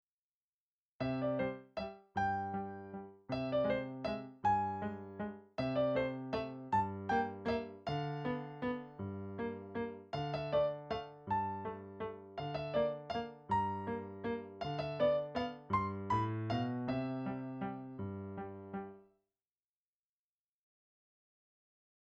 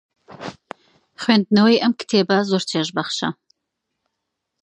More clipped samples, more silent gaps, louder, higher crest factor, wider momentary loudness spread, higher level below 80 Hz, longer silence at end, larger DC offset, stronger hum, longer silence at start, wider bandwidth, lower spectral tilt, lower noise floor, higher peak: neither; neither; second, -39 LUFS vs -19 LUFS; about the same, 18 dB vs 20 dB; second, 10 LU vs 21 LU; about the same, -64 dBFS vs -66 dBFS; first, 3.05 s vs 1.3 s; neither; neither; first, 1 s vs 0.3 s; second, 8 kHz vs 10 kHz; first, -8 dB/octave vs -5 dB/octave; first, under -90 dBFS vs -79 dBFS; second, -22 dBFS vs -2 dBFS